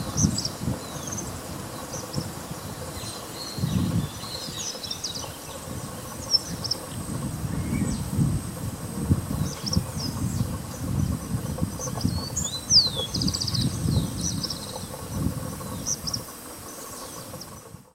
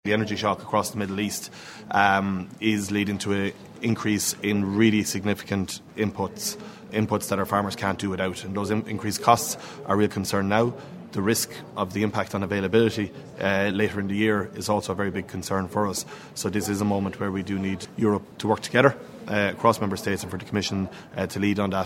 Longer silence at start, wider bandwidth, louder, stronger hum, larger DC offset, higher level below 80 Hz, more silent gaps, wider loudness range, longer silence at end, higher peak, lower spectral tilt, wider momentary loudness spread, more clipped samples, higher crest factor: about the same, 0 s vs 0.05 s; about the same, 16 kHz vs 16 kHz; second, -28 LUFS vs -25 LUFS; neither; neither; first, -42 dBFS vs -60 dBFS; neither; first, 7 LU vs 3 LU; about the same, 0.1 s vs 0 s; second, -6 dBFS vs 0 dBFS; about the same, -4 dB/octave vs -5 dB/octave; about the same, 11 LU vs 10 LU; neither; about the same, 22 dB vs 24 dB